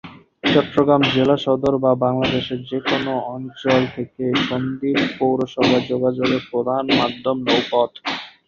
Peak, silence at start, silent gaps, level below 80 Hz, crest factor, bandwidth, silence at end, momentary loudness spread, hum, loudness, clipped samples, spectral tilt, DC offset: -2 dBFS; 0.05 s; none; -52 dBFS; 18 dB; 7.2 kHz; 0.2 s; 8 LU; none; -19 LUFS; under 0.1%; -6 dB/octave; under 0.1%